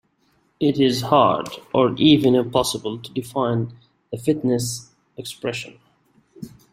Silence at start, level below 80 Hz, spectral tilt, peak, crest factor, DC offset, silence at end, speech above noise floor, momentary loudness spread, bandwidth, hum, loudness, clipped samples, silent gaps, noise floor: 0.6 s; -56 dBFS; -5.5 dB/octave; -2 dBFS; 20 dB; under 0.1%; 0.25 s; 44 dB; 19 LU; 16 kHz; none; -20 LUFS; under 0.1%; none; -64 dBFS